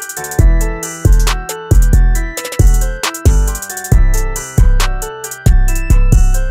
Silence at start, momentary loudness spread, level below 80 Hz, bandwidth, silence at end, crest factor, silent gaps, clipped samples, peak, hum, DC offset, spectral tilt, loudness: 0 s; 6 LU; -12 dBFS; 16 kHz; 0 s; 10 dB; none; under 0.1%; 0 dBFS; none; under 0.1%; -5 dB/octave; -14 LUFS